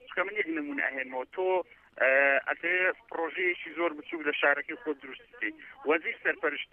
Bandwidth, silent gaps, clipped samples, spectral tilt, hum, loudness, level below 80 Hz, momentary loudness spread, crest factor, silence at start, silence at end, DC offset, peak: 3.8 kHz; none; under 0.1%; -6 dB/octave; none; -29 LUFS; -76 dBFS; 11 LU; 20 dB; 0.05 s; 0.05 s; under 0.1%; -12 dBFS